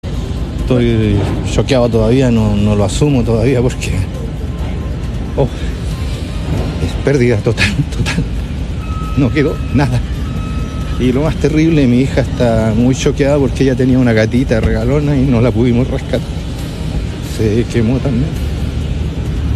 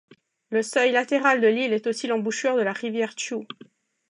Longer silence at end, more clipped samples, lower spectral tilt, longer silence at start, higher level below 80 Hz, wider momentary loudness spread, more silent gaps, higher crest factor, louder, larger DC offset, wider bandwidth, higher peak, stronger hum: second, 0 s vs 0.65 s; neither; first, -7 dB/octave vs -3.5 dB/octave; second, 0.05 s vs 0.5 s; first, -22 dBFS vs -82 dBFS; about the same, 9 LU vs 11 LU; neither; about the same, 14 dB vs 18 dB; first, -14 LUFS vs -23 LUFS; neither; first, 13.5 kHz vs 11 kHz; first, 0 dBFS vs -6 dBFS; neither